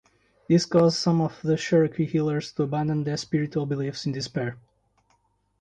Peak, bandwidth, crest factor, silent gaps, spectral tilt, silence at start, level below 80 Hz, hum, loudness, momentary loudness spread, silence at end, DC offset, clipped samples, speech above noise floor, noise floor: -8 dBFS; 9.4 kHz; 18 dB; none; -6.5 dB/octave; 0.5 s; -60 dBFS; none; -25 LUFS; 8 LU; 1.05 s; under 0.1%; under 0.1%; 44 dB; -68 dBFS